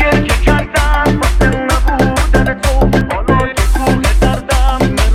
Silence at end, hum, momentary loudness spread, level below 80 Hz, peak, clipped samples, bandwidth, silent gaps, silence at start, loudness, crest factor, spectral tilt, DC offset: 0 s; none; 2 LU; -14 dBFS; 0 dBFS; under 0.1%; 15 kHz; none; 0 s; -13 LUFS; 10 dB; -5.5 dB/octave; under 0.1%